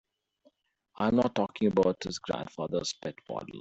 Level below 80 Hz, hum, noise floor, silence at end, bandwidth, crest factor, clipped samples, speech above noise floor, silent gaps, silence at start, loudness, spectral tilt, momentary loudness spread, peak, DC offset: -62 dBFS; none; -68 dBFS; 0 s; 8.2 kHz; 20 dB; under 0.1%; 38 dB; none; 1 s; -30 LUFS; -5.5 dB/octave; 12 LU; -12 dBFS; under 0.1%